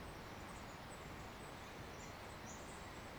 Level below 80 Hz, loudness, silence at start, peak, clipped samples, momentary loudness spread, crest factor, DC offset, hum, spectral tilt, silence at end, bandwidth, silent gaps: -62 dBFS; -52 LUFS; 0 s; -40 dBFS; under 0.1%; 1 LU; 12 dB; under 0.1%; none; -4 dB/octave; 0 s; over 20 kHz; none